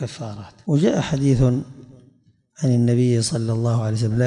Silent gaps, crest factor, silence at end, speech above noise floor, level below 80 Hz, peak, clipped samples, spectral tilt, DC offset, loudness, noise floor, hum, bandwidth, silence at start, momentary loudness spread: none; 14 dB; 0 s; 38 dB; -44 dBFS; -6 dBFS; under 0.1%; -7 dB/octave; under 0.1%; -20 LUFS; -57 dBFS; none; 11 kHz; 0 s; 15 LU